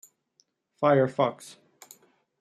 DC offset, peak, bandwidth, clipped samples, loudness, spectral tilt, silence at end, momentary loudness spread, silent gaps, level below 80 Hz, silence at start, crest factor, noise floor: under 0.1%; -8 dBFS; 15 kHz; under 0.1%; -25 LUFS; -6.5 dB/octave; 1.05 s; 24 LU; none; -76 dBFS; 0.8 s; 20 dB; -70 dBFS